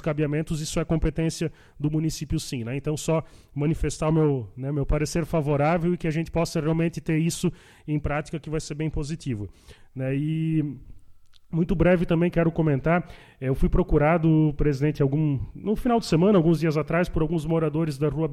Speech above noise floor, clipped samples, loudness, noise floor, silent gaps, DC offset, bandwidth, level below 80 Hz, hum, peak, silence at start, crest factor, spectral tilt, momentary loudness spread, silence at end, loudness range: 24 dB; under 0.1%; -25 LUFS; -48 dBFS; none; under 0.1%; 13.5 kHz; -36 dBFS; none; -8 dBFS; 0 s; 16 dB; -7 dB/octave; 10 LU; 0 s; 7 LU